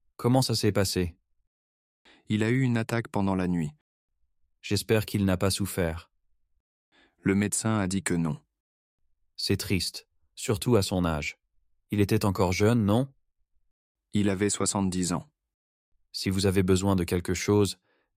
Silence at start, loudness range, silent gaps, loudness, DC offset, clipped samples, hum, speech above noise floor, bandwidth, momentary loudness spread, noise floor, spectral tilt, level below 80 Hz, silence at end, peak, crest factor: 0.2 s; 3 LU; 1.47-2.05 s, 3.81-4.08 s, 6.60-6.92 s, 8.60-8.98 s, 13.71-13.95 s, 15.54-15.92 s; -27 LUFS; under 0.1%; under 0.1%; none; 45 dB; 16 kHz; 9 LU; -70 dBFS; -5 dB/octave; -56 dBFS; 0.45 s; -10 dBFS; 18 dB